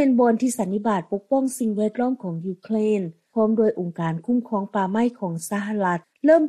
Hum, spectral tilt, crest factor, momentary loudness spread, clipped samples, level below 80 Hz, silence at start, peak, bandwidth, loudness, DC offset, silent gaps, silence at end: none; -6.5 dB/octave; 16 dB; 8 LU; under 0.1%; -68 dBFS; 0 s; -6 dBFS; 14 kHz; -23 LUFS; under 0.1%; none; 0 s